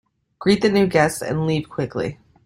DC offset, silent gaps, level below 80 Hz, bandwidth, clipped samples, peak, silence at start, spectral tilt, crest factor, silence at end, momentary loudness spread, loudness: under 0.1%; none; -52 dBFS; 16 kHz; under 0.1%; -4 dBFS; 0.4 s; -5.5 dB/octave; 18 dB; 0.3 s; 10 LU; -20 LUFS